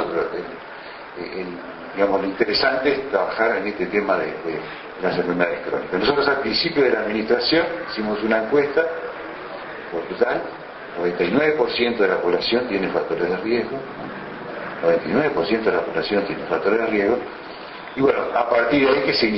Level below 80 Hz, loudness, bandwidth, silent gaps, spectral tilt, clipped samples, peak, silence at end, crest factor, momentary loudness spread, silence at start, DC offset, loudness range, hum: -54 dBFS; -21 LUFS; 6 kHz; none; -7 dB/octave; under 0.1%; -4 dBFS; 0 s; 18 dB; 14 LU; 0 s; under 0.1%; 3 LU; none